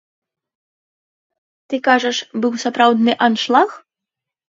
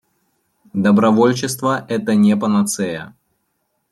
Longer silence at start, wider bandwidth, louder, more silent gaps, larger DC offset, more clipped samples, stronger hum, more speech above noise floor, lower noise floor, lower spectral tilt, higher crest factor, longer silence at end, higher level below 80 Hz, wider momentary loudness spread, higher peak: first, 1.7 s vs 0.75 s; second, 7.8 kHz vs 13.5 kHz; about the same, -16 LUFS vs -16 LUFS; neither; neither; neither; neither; first, 69 dB vs 54 dB; first, -84 dBFS vs -69 dBFS; second, -3.5 dB/octave vs -5.5 dB/octave; about the same, 18 dB vs 16 dB; second, 0.7 s vs 0.85 s; second, -74 dBFS vs -64 dBFS; second, 7 LU vs 10 LU; about the same, 0 dBFS vs -2 dBFS